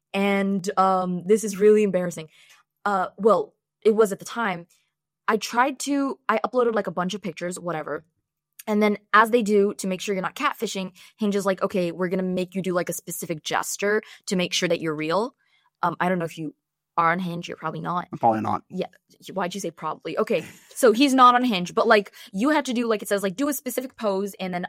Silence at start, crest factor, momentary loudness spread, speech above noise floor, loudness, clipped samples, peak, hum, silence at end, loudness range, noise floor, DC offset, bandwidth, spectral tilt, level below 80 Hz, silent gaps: 0.15 s; 20 dB; 12 LU; 30 dB; -23 LUFS; under 0.1%; -4 dBFS; none; 0 s; 6 LU; -54 dBFS; under 0.1%; 16.5 kHz; -4.5 dB/octave; -72 dBFS; none